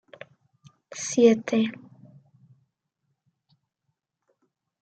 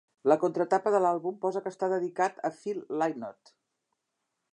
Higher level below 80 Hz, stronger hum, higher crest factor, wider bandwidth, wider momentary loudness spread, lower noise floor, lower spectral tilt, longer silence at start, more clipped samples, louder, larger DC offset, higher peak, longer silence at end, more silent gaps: first, -80 dBFS vs -86 dBFS; neither; about the same, 22 dB vs 20 dB; second, 9 kHz vs 10 kHz; first, 28 LU vs 9 LU; about the same, -80 dBFS vs -83 dBFS; second, -4.5 dB/octave vs -6.5 dB/octave; first, 0.95 s vs 0.25 s; neither; first, -23 LUFS vs -29 LUFS; neither; first, -6 dBFS vs -10 dBFS; first, 3.1 s vs 1.2 s; neither